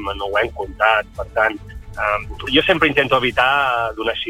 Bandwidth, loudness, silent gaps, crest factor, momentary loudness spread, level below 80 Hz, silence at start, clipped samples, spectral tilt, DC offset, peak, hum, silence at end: 16.5 kHz; -18 LUFS; none; 18 dB; 9 LU; -38 dBFS; 0 s; under 0.1%; -5 dB/octave; under 0.1%; -2 dBFS; none; 0 s